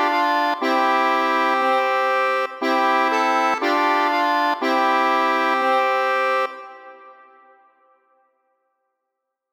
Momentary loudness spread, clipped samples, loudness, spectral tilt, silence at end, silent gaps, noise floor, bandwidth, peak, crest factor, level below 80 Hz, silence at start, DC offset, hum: 3 LU; under 0.1%; -19 LUFS; -1.5 dB/octave; 2.4 s; none; -80 dBFS; 19.5 kHz; -6 dBFS; 14 dB; -80 dBFS; 0 s; under 0.1%; none